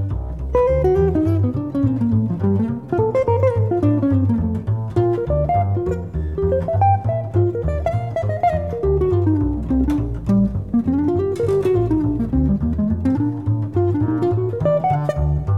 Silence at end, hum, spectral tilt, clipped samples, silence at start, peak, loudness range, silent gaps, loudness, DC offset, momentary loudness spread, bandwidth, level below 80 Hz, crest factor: 0 s; none; -10.5 dB/octave; under 0.1%; 0 s; -6 dBFS; 1 LU; none; -19 LUFS; 0.3%; 5 LU; 7 kHz; -30 dBFS; 12 dB